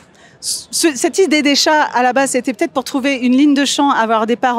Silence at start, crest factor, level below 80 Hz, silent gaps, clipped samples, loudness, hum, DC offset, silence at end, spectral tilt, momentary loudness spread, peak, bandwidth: 0.4 s; 14 dB; -64 dBFS; none; under 0.1%; -14 LUFS; none; under 0.1%; 0 s; -2 dB/octave; 7 LU; -2 dBFS; 16 kHz